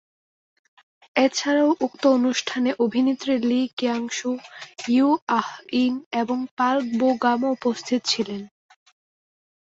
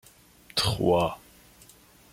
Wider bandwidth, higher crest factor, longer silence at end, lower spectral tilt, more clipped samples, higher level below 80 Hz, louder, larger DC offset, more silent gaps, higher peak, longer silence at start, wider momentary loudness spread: second, 7.8 kHz vs 16.5 kHz; about the same, 18 dB vs 20 dB; first, 1.25 s vs 0.95 s; about the same, -3.5 dB/octave vs -4.5 dB/octave; neither; second, -70 dBFS vs -52 dBFS; first, -22 LUFS vs -26 LUFS; neither; first, 3.73-3.77 s, 5.22-5.27 s, 6.06-6.11 s, 6.51-6.57 s vs none; first, -4 dBFS vs -10 dBFS; first, 1.15 s vs 0.55 s; about the same, 7 LU vs 9 LU